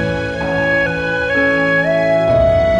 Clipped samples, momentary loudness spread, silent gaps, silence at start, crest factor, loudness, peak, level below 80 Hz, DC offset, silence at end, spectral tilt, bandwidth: under 0.1%; 6 LU; none; 0 s; 10 dB; -14 LUFS; -4 dBFS; -32 dBFS; under 0.1%; 0 s; -6.5 dB/octave; 9.8 kHz